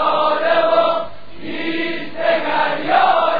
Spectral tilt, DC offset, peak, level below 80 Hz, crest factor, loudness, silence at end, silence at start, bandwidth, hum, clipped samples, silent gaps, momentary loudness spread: -6 dB/octave; 4%; -2 dBFS; -54 dBFS; 14 dB; -17 LUFS; 0 s; 0 s; 5 kHz; none; under 0.1%; none; 12 LU